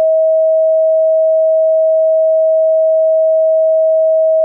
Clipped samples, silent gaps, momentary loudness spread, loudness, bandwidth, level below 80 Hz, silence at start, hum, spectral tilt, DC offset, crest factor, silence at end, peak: under 0.1%; none; 0 LU; -11 LUFS; 0.8 kHz; under -90 dBFS; 0 s; none; -5 dB/octave; under 0.1%; 4 dB; 0 s; -8 dBFS